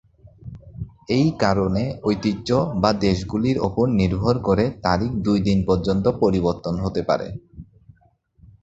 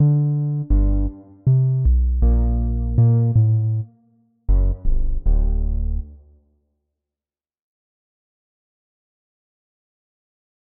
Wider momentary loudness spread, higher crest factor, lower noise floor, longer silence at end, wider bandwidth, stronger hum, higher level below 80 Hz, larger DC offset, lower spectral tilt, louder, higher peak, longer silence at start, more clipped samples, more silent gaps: first, 14 LU vs 10 LU; first, 20 dB vs 14 dB; second, -59 dBFS vs under -90 dBFS; second, 1 s vs 4.5 s; first, 8 kHz vs 1.6 kHz; neither; second, -40 dBFS vs -22 dBFS; neither; second, -7.5 dB/octave vs -16 dB/octave; about the same, -21 LUFS vs -20 LUFS; first, -2 dBFS vs -6 dBFS; first, 0.25 s vs 0 s; neither; neither